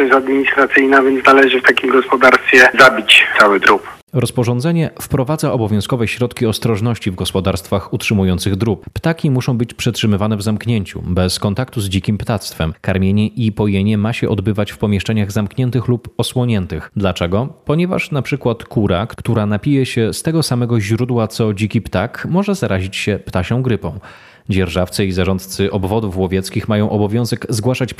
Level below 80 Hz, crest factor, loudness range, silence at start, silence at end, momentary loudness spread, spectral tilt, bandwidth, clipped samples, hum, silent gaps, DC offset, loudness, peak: -44 dBFS; 14 dB; 9 LU; 0 s; 0.05 s; 10 LU; -5.5 dB/octave; 15 kHz; under 0.1%; none; 4.03-4.07 s; under 0.1%; -15 LUFS; 0 dBFS